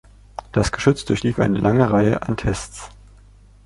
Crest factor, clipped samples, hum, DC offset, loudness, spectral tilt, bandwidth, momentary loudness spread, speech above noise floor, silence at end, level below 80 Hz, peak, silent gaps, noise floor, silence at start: 18 dB; under 0.1%; 50 Hz at -35 dBFS; under 0.1%; -19 LUFS; -6.5 dB/octave; 11.5 kHz; 21 LU; 29 dB; 0.8 s; -38 dBFS; -2 dBFS; none; -47 dBFS; 0.55 s